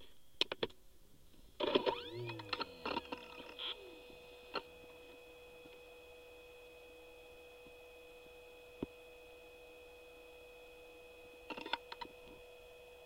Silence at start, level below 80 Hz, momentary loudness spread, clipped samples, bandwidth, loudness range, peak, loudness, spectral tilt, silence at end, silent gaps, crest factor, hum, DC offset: 0 s; -68 dBFS; 18 LU; under 0.1%; 16 kHz; 15 LU; -14 dBFS; -43 LUFS; -4 dB/octave; 0 s; none; 32 dB; none; under 0.1%